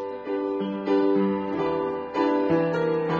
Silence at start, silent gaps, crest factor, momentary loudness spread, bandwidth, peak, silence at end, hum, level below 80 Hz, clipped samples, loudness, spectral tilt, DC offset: 0 s; none; 12 dB; 6 LU; 7 kHz; -12 dBFS; 0 s; none; -62 dBFS; under 0.1%; -25 LUFS; -8.5 dB/octave; under 0.1%